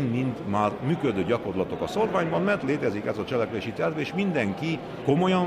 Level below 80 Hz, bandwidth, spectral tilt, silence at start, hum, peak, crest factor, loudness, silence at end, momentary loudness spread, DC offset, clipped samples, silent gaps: -58 dBFS; 13 kHz; -7 dB/octave; 0 s; none; -10 dBFS; 16 dB; -27 LUFS; 0 s; 5 LU; under 0.1%; under 0.1%; none